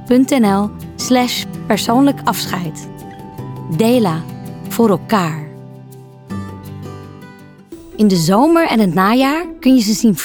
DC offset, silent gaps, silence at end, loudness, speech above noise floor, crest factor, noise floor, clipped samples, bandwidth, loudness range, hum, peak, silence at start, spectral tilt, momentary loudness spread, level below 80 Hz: under 0.1%; none; 0 s; -14 LUFS; 25 dB; 14 dB; -38 dBFS; under 0.1%; 19 kHz; 6 LU; none; -2 dBFS; 0 s; -5.5 dB/octave; 20 LU; -46 dBFS